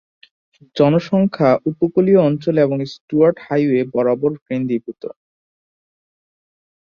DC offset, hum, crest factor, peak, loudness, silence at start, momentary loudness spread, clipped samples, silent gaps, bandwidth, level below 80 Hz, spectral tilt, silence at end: under 0.1%; none; 16 dB; -2 dBFS; -17 LUFS; 0.75 s; 10 LU; under 0.1%; 3.01-3.08 s, 4.42-4.46 s; 7 kHz; -60 dBFS; -9 dB/octave; 1.7 s